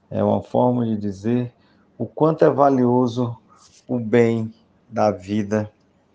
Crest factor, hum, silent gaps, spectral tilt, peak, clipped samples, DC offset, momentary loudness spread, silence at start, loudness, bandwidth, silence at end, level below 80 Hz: 20 dB; none; none; -8.5 dB/octave; -2 dBFS; under 0.1%; under 0.1%; 15 LU; 0.1 s; -20 LUFS; 7.8 kHz; 0.45 s; -64 dBFS